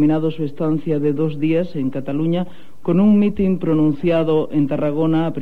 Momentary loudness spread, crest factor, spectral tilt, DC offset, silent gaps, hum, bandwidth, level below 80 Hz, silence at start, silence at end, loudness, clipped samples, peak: 8 LU; 12 dB; -10 dB/octave; 4%; none; none; 4.6 kHz; -48 dBFS; 0 s; 0 s; -19 LUFS; under 0.1%; -6 dBFS